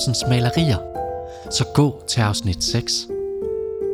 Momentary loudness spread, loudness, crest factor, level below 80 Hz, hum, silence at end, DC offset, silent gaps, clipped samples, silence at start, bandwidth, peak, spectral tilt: 9 LU; -21 LUFS; 16 dB; -40 dBFS; none; 0 s; under 0.1%; none; under 0.1%; 0 s; 15.5 kHz; -4 dBFS; -5 dB/octave